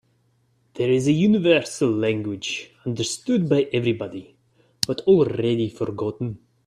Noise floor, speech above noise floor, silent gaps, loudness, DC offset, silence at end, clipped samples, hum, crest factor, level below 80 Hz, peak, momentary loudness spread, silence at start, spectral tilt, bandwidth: -64 dBFS; 43 dB; none; -22 LUFS; under 0.1%; 0.3 s; under 0.1%; none; 22 dB; -60 dBFS; 0 dBFS; 11 LU; 0.75 s; -5.5 dB/octave; 14.5 kHz